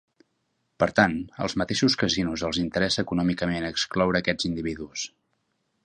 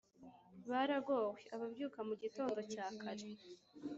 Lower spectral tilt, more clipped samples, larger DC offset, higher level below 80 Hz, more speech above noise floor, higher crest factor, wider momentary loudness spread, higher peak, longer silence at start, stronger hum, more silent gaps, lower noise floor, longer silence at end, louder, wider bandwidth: about the same, -4.5 dB/octave vs -3.5 dB/octave; neither; neither; first, -50 dBFS vs -86 dBFS; first, 49 dB vs 20 dB; first, 24 dB vs 18 dB; second, 9 LU vs 20 LU; first, -2 dBFS vs -26 dBFS; first, 0.8 s vs 0.2 s; neither; neither; first, -74 dBFS vs -62 dBFS; first, 0.75 s vs 0 s; first, -25 LUFS vs -43 LUFS; first, 9.8 kHz vs 8 kHz